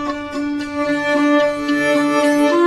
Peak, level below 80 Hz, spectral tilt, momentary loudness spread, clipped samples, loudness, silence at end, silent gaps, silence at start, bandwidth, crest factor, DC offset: -4 dBFS; -50 dBFS; -4 dB/octave; 8 LU; under 0.1%; -17 LUFS; 0 s; none; 0 s; 13 kHz; 12 dB; under 0.1%